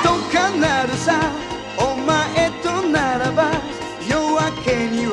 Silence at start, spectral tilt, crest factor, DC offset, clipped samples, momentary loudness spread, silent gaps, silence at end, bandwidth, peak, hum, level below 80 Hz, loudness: 0 s; -4.5 dB/octave; 16 dB; under 0.1%; under 0.1%; 6 LU; none; 0 s; 11.5 kHz; -2 dBFS; none; -42 dBFS; -19 LUFS